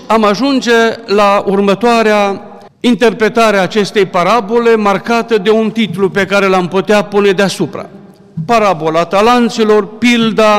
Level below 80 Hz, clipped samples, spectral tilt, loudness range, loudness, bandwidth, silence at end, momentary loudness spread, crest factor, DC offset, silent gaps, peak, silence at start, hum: -44 dBFS; under 0.1%; -5 dB/octave; 1 LU; -11 LUFS; 16 kHz; 0 s; 5 LU; 8 dB; under 0.1%; none; -2 dBFS; 0 s; none